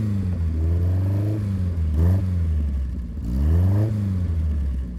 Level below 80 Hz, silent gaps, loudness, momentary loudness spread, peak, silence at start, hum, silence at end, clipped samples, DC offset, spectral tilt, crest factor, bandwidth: -26 dBFS; none; -23 LUFS; 6 LU; -10 dBFS; 0 s; none; 0 s; under 0.1%; under 0.1%; -9.5 dB/octave; 12 dB; 5.2 kHz